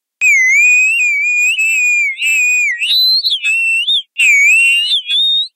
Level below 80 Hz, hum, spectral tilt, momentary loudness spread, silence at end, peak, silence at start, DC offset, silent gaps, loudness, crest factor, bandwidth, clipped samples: -72 dBFS; none; 6.5 dB/octave; 5 LU; 0.1 s; -2 dBFS; 0.2 s; under 0.1%; none; -9 LUFS; 10 dB; 16 kHz; under 0.1%